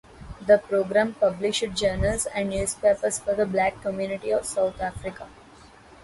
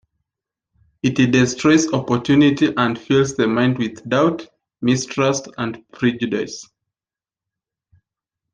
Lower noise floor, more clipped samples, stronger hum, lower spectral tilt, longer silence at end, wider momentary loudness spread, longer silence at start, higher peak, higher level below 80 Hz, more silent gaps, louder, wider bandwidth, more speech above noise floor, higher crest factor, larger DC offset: second, -50 dBFS vs under -90 dBFS; neither; neither; second, -4 dB/octave vs -5.5 dB/octave; second, 0.7 s vs 1.9 s; about the same, 13 LU vs 11 LU; second, 0.15 s vs 1.05 s; second, -6 dBFS vs -2 dBFS; first, -44 dBFS vs -54 dBFS; neither; second, -24 LUFS vs -18 LUFS; first, 12 kHz vs 9.6 kHz; second, 26 dB vs over 72 dB; about the same, 20 dB vs 18 dB; neither